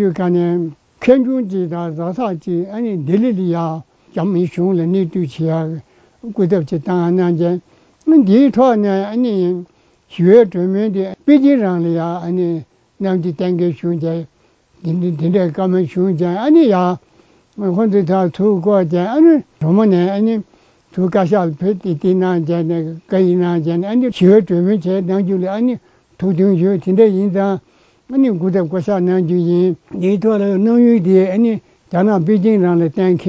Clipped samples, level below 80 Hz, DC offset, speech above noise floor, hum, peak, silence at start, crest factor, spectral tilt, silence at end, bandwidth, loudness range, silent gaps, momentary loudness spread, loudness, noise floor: under 0.1%; -56 dBFS; under 0.1%; 40 dB; none; 0 dBFS; 0 s; 14 dB; -9.5 dB/octave; 0 s; 7.4 kHz; 4 LU; none; 10 LU; -15 LUFS; -53 dBFS